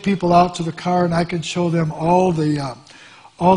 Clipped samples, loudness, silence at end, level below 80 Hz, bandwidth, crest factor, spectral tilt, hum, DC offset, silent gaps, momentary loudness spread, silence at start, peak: under 0.1%; -18 LUFS; 0 s; -48 dBFS; 10.5 kHz; 18 dB; -6.5 dB/octave; none; under 0.1%; none; 9 LU; 0 s; 0 dBFS